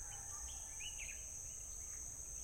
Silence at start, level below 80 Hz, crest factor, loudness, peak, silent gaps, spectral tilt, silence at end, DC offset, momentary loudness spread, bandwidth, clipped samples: 0 s; -58 dBFS; 14 dB; -46 LUFS; -34 dBFS; none; -0.5 dB/octave; 0 s; under 0.1%; 2 LU; 16.5 kHz; under 0.1%